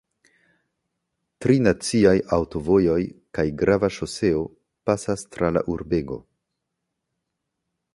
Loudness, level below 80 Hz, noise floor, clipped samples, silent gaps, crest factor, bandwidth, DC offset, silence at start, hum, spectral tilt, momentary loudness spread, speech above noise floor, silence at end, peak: -22 LUFS; -46 dBFS; -80 dBFS; under 0.1%; none; 20 dB; 11.5 kHz; under 0.1%; 1.4 s; none; -6 dB/octave; 10 LU; 59 dB; 1.75 s; -4 dBFS